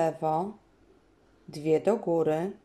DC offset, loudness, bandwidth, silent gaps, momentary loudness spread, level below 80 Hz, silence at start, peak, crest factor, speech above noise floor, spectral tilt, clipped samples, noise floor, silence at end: under 0.1%; -28 LUFS; 13 kHz; none; 11 LU; -68 dBFS; 0 s; -12 dBFS; 18 dB; 34 dB; -7.5 dB/octave; under 0.1%; -62 dBFS; 0.1 s